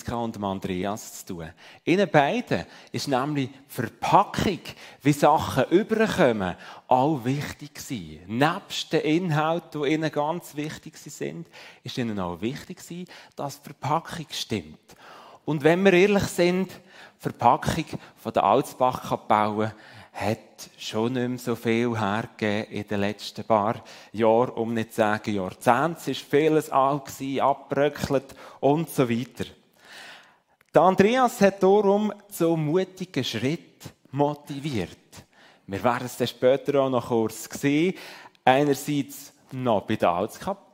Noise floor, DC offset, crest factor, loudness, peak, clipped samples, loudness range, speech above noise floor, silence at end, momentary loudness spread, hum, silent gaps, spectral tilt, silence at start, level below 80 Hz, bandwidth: -60 dBFS; under 0.1%; 22 dB; -25 LUFS; -2 dBFS; under 0.1%; 7 LU; 36 dB; 0.2 s; 16 LU; none; none; -5.5 dB/octave; 0.05 s; -56 dBFS; 16 kHz